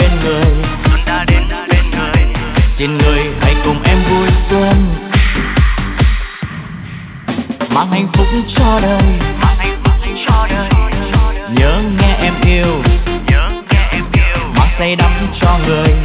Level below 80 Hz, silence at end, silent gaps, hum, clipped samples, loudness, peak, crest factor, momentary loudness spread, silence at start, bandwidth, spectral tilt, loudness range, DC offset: -14 dBFS; 0 s; none; none; under 0.1%; -13 LUFS; 0 dBFS; 10 dB; 4 LU; 0 s; 4 kHz; -10.5 dB/octave; 3 LU; under 0.1%